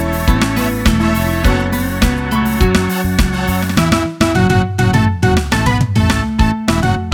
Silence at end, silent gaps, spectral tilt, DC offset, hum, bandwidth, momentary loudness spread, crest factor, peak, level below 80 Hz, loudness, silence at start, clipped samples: 0 s; none; -5.5 dB/octave; under 0.1%; none; 19.5 kHz; 3 LU; 14 dB; 0 dBFS; -20 dBFS; -14 LUFS; 0 s; under 0.1%